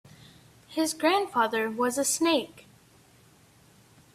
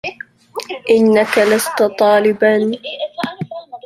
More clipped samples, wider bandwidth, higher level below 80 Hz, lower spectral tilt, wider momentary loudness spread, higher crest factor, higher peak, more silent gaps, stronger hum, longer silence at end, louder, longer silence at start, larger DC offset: neither; about the same, 16 kHz vs 15.5 kHz; second, -72 dBFS vs -60 dBFS; second, -2 dB/octave vs -4.5 dB/octave; second, 6 LU vs 16 LU; about the same, 18 dB vs 14 dB; second, -10 dBFS vs -2 dBFS; neither; neither; first, 1.55 s vs 0.1 s; second, -26 LUFS vs -14 LUFS; first, 0.7 s vs 0.05 s; neither